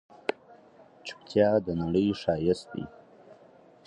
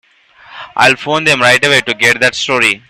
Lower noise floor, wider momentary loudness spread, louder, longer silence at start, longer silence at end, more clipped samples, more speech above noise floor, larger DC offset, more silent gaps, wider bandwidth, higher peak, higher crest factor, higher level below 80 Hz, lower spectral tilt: first, -56 dBFS vs -42 dBFS; first, 19 LU vs 3 LU; second, -28 LUFS vs -9 LUFS; second, 0.3 s vs 0.5 s; first, 0.55 s vs 0.1 s; second, under 0.1% vs 0.1%; about the same, 29 dB vs 31 dB; neither; neither; second, 10.5 kHz vs 16.5 kHz; second, -10 dBFS vs 0 dBFS; first, 20 dB vs 12 dB; about the same, -56 dBFS vs -52 dBFS; first, -7 dB/octave vs -2.5 dB/octave